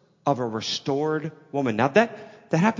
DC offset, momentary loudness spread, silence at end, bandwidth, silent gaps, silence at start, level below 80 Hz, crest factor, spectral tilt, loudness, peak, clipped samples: under 0.1%; 9 LU; 0 s; 7.6 kHz; none; 0.25 s; -66 dBFS; 20 dB; -5.5 dB/octave; -25 LUFS; -4 dBFS; under 0.1%